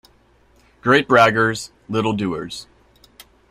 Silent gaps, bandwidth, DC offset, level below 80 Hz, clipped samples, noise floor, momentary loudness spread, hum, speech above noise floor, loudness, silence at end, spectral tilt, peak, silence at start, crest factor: none; 15.5 kHz; under 0.1%; -54 dBFS; under 0.1%; -55 dBFS; 17 LU; none; 37 dB; -18 LUFS; 0.9 s; -5 dB/octave; 0 dBFS; 0.85 s; 20 dB